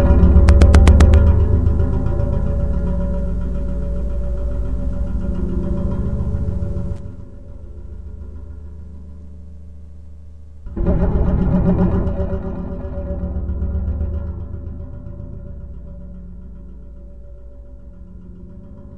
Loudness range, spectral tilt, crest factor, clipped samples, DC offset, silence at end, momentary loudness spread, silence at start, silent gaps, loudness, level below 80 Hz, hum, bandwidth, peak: 20 LU; -8.5 dB/octave; 18 dB; under 0.1%; under 0.1%; 0 s; 27 LU; 0 s; none; -18 LUFS; -20 dBFS; none; 11 kHz; 0 dBFS